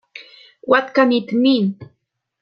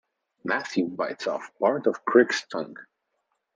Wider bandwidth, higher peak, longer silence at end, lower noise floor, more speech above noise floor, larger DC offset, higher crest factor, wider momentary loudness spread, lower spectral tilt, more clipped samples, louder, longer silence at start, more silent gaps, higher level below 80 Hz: second, 6.4 kHz vs 7.8 kHz; about the same, -2 dBFS vs -4 dBFS; about the same, 0.6 s vs 0.7 s; second, -44 dBFS vs -77 dBFS; second, 28 dB vs 52 dB; neither; about the same, 18 dB vs 22 dB; first, 22 LU vs 14 LU; first, -7 dB/octave vs -4.5 dB/octave; neither; first, -17 LUFS vs -25 LUFS; second, 0.15 s vs 0.45 s; neither; first, -66 dBFS vs -78 dBFS